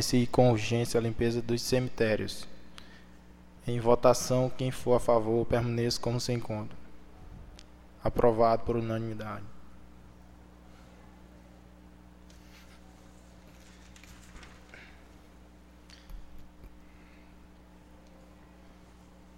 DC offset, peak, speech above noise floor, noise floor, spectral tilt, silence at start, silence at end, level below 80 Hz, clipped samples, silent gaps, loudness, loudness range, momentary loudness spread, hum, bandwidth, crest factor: under 0.1%; -10 dBFS; 27 dB; -54 dBFS; -5.5 dB/octave; 0 s; 0.65 s; -50 dBFS; under 0.1%; none; -29 LUFS; 24 LU; 26 LU; none; 16 kHz; 22 dB